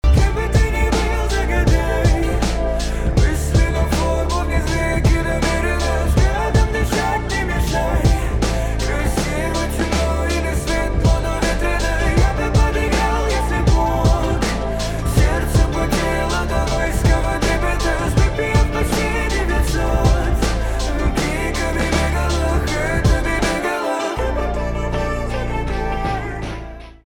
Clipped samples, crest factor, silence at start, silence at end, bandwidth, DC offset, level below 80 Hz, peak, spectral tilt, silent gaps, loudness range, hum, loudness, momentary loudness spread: under 0.1%; 14 dB; 0.05 s; 0.1 s; 17.5 kHz; under 0.1%; -20 dBFS; -4 dBFS; -5.5 dB/octave; none; 2 LU; none; -19 LUFS; 5 LU